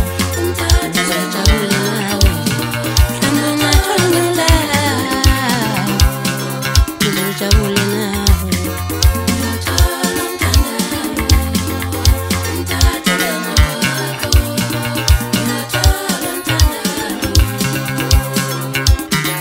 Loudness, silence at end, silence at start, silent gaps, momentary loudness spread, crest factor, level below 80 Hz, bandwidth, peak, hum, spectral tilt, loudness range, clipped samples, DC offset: -15 LUFS; 0 s; 0 s; none; 5 LU; 14 dB; -20 dBFS; 16.5 kHz; 0 dBFS; none; -4 dB/octave; 2 LU; under 0.1%; under 0.1%